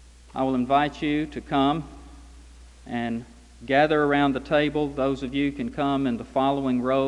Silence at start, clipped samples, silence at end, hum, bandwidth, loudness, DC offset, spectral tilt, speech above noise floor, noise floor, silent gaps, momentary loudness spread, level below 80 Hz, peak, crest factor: 0.35 s; under 0.1%; 0 s; none; 10.5 kHz; -24 LUFS; under 0.1%; -6.5 dB/octave; 23 dB; -47 dBFS; none; 10 LU; -48 dBFS; -6 dBFS; 18 dB